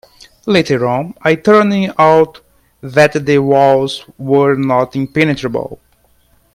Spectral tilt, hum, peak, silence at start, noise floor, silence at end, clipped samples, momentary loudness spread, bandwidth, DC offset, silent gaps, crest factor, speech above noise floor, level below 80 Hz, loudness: -6.5 dB/octave; none; 0 dBFS; 0.45 s; -53 dBFS; 0.8 s; under 0.1%; 11 LU; 15 kHz; under 0.1%; none; 14 dB; 42 dB; -50 dBFS; -12 LUFS